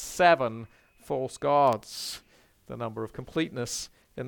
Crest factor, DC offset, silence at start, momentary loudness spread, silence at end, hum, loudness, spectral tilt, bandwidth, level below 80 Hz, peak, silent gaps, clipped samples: 22 dB; under 0.1%; 0 s; 20 LU; 0 s; none; -28 LUFS; -4 dB/octave; 19 kHz; -60 dBFS; -8 dBFS; none; under 0.1%